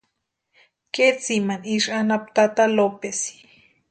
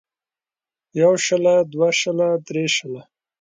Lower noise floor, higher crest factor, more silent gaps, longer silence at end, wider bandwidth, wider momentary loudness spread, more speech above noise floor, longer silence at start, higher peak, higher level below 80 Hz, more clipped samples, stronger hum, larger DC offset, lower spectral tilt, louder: second, -76 dBFS vs under -90 dBFS; about the same, 18 dB vs 16 dB; neither; first, 0.6 s vs 0.4 s; about the same, 9.4 kHz vs 9.4 kHz; second, 9 LU vs 12 LU; second, 55 dB vs over 72 dB; about the same, 0.95 s vs 0.95 s; about the same, -4 dBFS vs -4 dBFS; about the same, -70 dBFS vs -68 dBFS; neither; neither; neither; about the same, -3.5 dB/octave vs -3.5 dB/octave; about the same, -21 LUFS vs -19 LUFS